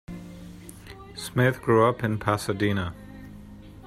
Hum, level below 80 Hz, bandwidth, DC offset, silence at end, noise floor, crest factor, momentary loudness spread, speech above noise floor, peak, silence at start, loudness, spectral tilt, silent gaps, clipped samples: none; -50 dBFS; 15.5 kHz; under 0.1%; 0 s; -44 dBFS; 20 dB; 23 LU; 21 dB; -6 dBFS; 0.1 s; -24 LUFS; -6.5 dB/octave; none; under 0.1%